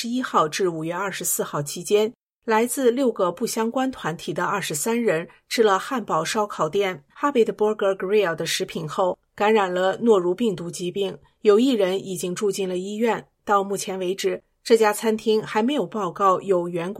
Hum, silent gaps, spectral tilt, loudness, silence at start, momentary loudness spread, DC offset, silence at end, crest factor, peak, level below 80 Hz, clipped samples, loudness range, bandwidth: none; 2.23-2.30 s; -4 dB/octave; -23 LUFS; 0 s; 8 LU; under 0.1%; 0 s; 18 dB; -4 dBFS; -66 dBFS; under 0.1%; 2 LU; 16 kHz